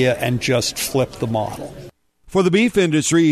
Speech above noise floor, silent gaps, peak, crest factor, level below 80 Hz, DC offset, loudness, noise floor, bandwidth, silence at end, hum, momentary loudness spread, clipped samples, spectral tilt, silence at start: 25 dB; none; -4 dBFS; 14 dB; -48 dBFS; under 0.1%; -18 LUFS; -43 dBFS; 13.5 kHz; 0 s; none; 10 LU; under 0.1%; -4.5 dB/octave; 0 s